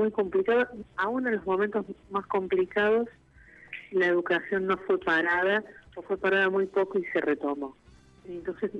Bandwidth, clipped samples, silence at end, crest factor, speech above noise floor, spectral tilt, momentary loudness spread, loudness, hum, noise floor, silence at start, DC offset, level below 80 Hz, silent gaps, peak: 6.8 kHz; under 0.1%; 0 s; 14 dB; 27 dB; -6.5 dB/octave; 13 LU; -27 LUFS; none; -54 dBFS; 0 s; under 0.1%; -62 dBFS; none; -14 dBFS